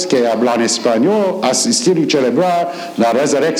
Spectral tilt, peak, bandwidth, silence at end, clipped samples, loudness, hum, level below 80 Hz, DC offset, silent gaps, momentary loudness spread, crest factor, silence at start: -3.5 dB/octave; -2 dBFS; 19.5 kHz; 0 s; under 0.1%; -14 LUFS; none; -70 dBFS; under 0.1%; none; 3 LU; 12 dB; 0 s